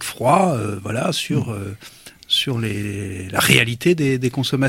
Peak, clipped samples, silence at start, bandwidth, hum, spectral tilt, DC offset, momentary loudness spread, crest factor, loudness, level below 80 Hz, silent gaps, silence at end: 0 dBFS; under 0.1%; 0 s; 16.5 kHz; none; -4.5 dB/octave; under 0.1%; 13 LU; 20 dB; -19 LUFS; -52 dBFS; none; 0 s